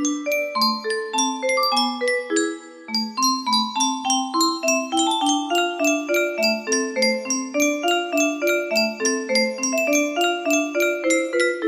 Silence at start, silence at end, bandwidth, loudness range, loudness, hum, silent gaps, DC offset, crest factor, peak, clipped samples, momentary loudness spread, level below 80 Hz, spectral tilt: 0 s; 0 s; 15.5 kHz; 1 LU; -21 LUFS; none; none; under 0.1%; 14 dB; -6 dBFS; under 0.1%; 4 LU; -72 dBFS; -1 dB/octave